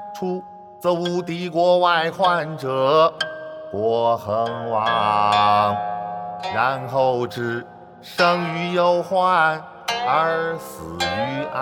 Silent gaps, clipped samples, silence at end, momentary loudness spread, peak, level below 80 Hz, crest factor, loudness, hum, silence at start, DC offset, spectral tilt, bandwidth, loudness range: none; under 0.1%; 0 s; 11 LU; -4 dBFS; -60 dBFS; 16 dB; -20 LUFS; none; 0 s; under 0.1%; -5 dB/octave; 17.5 kHz; 2 LU